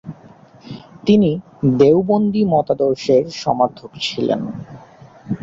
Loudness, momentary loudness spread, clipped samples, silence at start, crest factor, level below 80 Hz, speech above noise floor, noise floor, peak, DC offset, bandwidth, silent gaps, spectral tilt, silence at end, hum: -17 LUFS; 22 LU; under 0.1%; 0.05 s; 16 dB; -52 dBFS; 29 dB; -44 dBFS; -2 dBFS; under 0.1%; 7.8 kHz; none; -7 dB/octave; 0.05 s; none